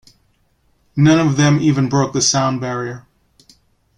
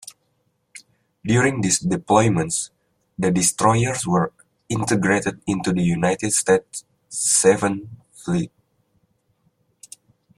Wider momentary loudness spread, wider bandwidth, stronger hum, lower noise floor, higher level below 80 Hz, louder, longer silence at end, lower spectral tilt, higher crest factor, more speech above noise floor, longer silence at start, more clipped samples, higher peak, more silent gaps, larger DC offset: second, 14 LU vs 17 LU; second, 10.5 kHz vs 15 kHz; neither; second, -60 dBFS vs -69 dBFS; about the same, -50 dBFS vs -54 dBFS; first, -15 LUFS vs -20 LUFS; second, 1 s vs 1.9 s; about the same, -5 dB/octave vs -4.5 dB/octave; about the same, 16 dB vs 20 dB; second, 45 dB vs 49 dB; first, 0.95 s vs 0.75 s; neither; about the same, -2 dBFS vs -2 dBFS; neither; neither